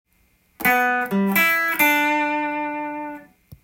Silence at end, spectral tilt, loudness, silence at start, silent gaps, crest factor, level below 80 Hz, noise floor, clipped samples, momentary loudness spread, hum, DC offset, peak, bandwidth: 0.4 s; -4 dB/octave; -19 LUFS; 0.6 s; none; 18 dB; -62 dBFS; -62 dBFS; under 0.1%; 14 LU; none; under 0.1%; -2 dBFS; 17 kHz